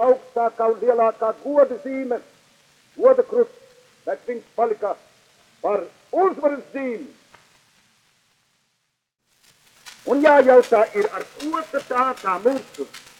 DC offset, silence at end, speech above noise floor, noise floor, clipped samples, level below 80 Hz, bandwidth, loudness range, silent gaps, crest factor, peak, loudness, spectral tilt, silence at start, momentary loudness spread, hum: under 0.1%; 0.2 s; 55 dB; -74 dBFS; under 0.1%; -72 dBFS; 12.5 kHz; 9 LU; none; 20 dB; -2 dBFS; -20 LUFS; -4.5 dB/octave; 0 s; 15 LU; none